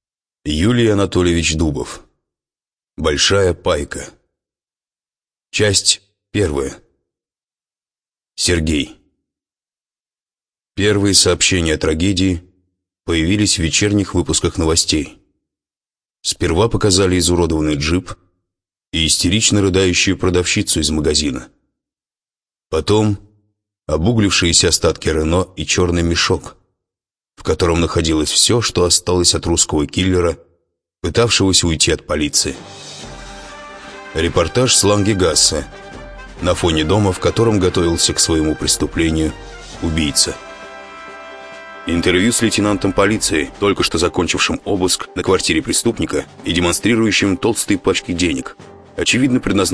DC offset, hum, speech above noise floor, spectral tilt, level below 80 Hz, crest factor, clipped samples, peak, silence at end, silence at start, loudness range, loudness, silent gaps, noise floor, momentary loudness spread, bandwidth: under 0.1%; none; over 75 dB; -3.5 dB/octave; -34 dBFS; 18 dB; under 0.1%; 0 dBFS; 0 s; 0.45 s; 5 LU; -15 LUFS; none; under -90 dBFS; 19 LU; 11 kHz